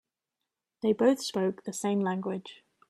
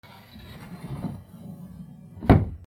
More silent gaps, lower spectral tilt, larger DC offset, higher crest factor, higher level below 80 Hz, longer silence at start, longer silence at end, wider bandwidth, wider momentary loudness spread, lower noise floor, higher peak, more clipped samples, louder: neither; second, -5.5 dB/octave vs -9 dB/octave; neither; second, 18 dB vs 26 dB; second, -76 dBFS vs -36 dBFS; first, 0.85 s vs 0.35 s; first, 0.35 s vs 0.1 s; about the same, 13.5 kHz vs 14.5 kHz; second, 11 LU vs 24 LU; first, -87 dBFS vs -46 dBFS; second, -12 dBFS vs -2 dBFS; neither; second, -29 LUFS vs -25 LUFS